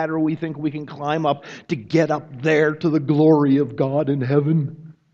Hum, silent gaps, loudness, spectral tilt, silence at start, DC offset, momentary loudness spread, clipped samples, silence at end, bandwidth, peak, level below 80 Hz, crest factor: none; none; -20 LUFS; -8 dB/octave; 0 s; under 0.1%; 12 LU; under 0.1%; 0.2 s; 7.4 kHz; -4 dBFS; -62 dBFS; 16 dB